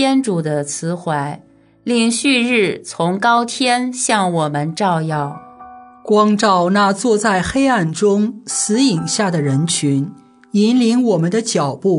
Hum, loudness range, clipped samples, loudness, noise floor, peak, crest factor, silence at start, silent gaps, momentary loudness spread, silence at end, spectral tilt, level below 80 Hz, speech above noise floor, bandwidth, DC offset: none; 2 LU; under 0.1%; -16 LUFS; -39 dBFS; -2 dBFS; 14 dB; 0 s; none; 8 LU; 0 s; -4.5 dB/octave; -52 dBFS; 23 dB; 11 kHz; under 0.1%